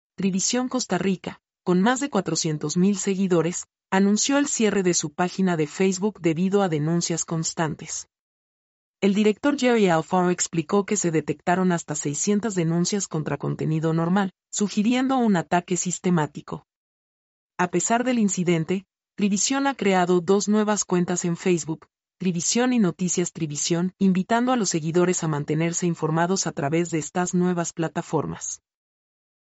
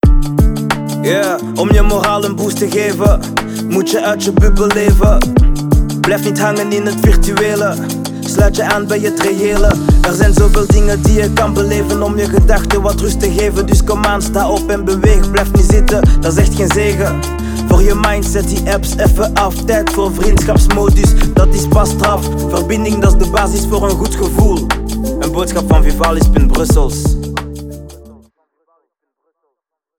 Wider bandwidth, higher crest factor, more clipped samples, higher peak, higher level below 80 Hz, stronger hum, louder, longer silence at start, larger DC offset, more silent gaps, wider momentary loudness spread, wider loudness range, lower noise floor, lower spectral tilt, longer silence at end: second, 8.2 kHz vs 18.5 kHz; first, 16 dB vs 10 dB; neither; second, -8 dBFS vs 0 dBFS; second, -64 dBFS vs -14 dBFS; neither; second, -23 LUFS vs -13 LUFS; first, 0.2 s vs 0.05 s; neither; first, 8.19-8.94 s, 16.76-17.50 s vs none; about the same, 7 LU vs 5 LU; about the same, 3 LU vs 2 LU; first, under -90 dBFS vs -74 dBFS; about the same, -4.5 dB/octave vs -5.5 dB/octave; second, 0.9 s vs 2 s